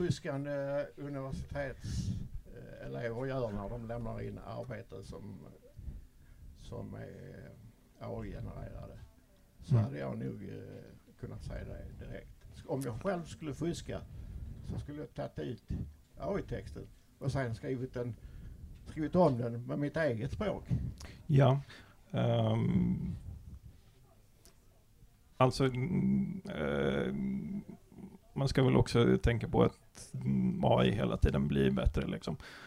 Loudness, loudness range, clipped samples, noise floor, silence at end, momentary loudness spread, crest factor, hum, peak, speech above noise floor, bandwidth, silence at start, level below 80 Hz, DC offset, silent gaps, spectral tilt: -35 LUFS; 14 LU; under 0.1%; -63 dBFS; 0 s; 21 LU; 22 dB; none; -12 dBFS; 28 dB; 12.5 kHz; 0 s; -48 dBFS; under 0.1%; none; -7.5 dB/octave